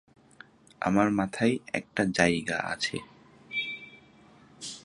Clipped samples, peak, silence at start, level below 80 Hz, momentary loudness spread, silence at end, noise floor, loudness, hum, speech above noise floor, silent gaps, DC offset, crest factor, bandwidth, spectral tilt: under 0.1%; -6 dBFS; 0.8 s; -60 dBFS; 16 LU; 0.05 s; -56 dBFS; -28 LUFS; none; 29 dB; none; under 0.1%; 26 dB; 11.5 kHz; -4.5 dB/octave